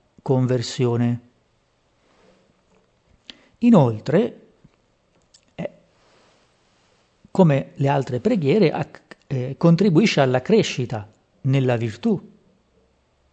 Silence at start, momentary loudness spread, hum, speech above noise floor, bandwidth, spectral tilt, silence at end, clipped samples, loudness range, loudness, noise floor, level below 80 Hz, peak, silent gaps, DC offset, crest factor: 0.25 s; 13 LU; none; 46 dB; 8.4 kHz; -7 dB/octave; 1.05 s; under 0.1%; 7 LU; -20 LUFS; -64 dBFS; -62 dBFS; -4 dBFS; none; under 0.1%; 18 dB